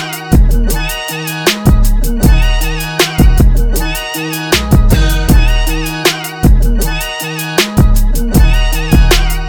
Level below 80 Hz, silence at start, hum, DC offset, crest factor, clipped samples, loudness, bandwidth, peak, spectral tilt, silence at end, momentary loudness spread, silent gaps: -10 dBFS; 0 s; none; under 0.1%; 10 dB; under 0.1%; -12 LUFS; over 20 kHz; 0 dBFS; -4.5 dB/octave; 0 s; 7 LU; none